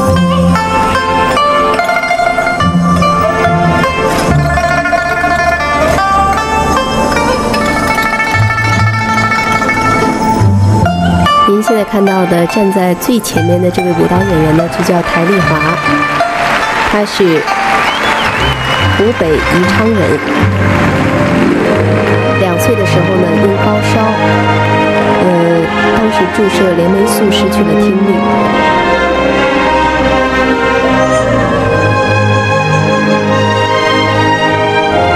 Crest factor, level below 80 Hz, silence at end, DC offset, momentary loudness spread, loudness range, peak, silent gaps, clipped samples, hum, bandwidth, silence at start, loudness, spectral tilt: 10 dB; -28 dBFS; 0 s; under 0.1%; 2 LU; 1 LU; 0 dBFS; none; under 0.1%; none; 16.5 kHz; 0 s; -10 LUFS; -5.5 dB/octave